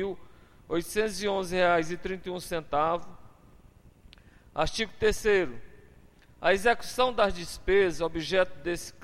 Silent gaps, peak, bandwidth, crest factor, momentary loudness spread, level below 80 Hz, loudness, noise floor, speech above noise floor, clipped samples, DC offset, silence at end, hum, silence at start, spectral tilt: none; -12 dBFS; 16 kHz; 18 dB; 10 LU; -48 dBFS; -28 LUFS; -56 dBFS; 28 dB; under 0.1%; under 0.1%; 0 s; none; 0 s; -4 dB/octave